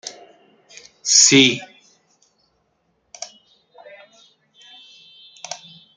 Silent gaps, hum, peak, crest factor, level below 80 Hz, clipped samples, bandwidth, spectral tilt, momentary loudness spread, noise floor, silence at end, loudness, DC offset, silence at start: none; none; 0 dBFS; 24 dB; -70 dBFS; under 0.1%; 11 kHz; -1.5 dB/octave; 26 LU; -67 dBFS; 0.4 s; -13 LUFS; under 0.1%; 0.05 s